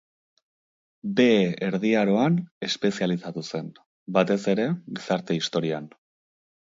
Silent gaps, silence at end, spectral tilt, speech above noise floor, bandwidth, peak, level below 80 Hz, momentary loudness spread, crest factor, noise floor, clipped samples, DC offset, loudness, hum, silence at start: 2.51-2.61 s, 3.86-4.06 s; 0.8 s; -6 dB/octave; over 66 dB; 7.8 kHz; -6 dBFS; -70 dBFS; 12 LU; 20 dB; under -90 dBFS; under 0.1%; under 0.1%; -25 LUFS; none; 1.05 s